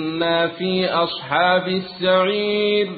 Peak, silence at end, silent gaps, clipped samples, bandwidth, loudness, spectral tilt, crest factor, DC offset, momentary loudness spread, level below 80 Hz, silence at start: -4 dBFS; 0 s; none; under 0.1%; 4.8 kHz; -19 LUFS; -10 dB/octave; 16 dB; under 0.1%; 4 LU; -58 dBFS; 0 s